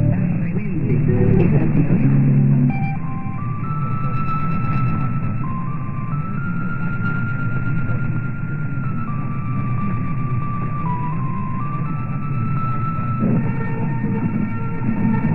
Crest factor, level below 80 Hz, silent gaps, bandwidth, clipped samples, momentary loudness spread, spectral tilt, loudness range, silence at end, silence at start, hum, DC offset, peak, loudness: 16 dB; -34 dBFS; none; 4 kHz; under 0.1%; 9 LU; -12 dB/octave; 6 LU; 0 s; 0 s; none; under 0.1%; -2 dBFS; -21 LUFS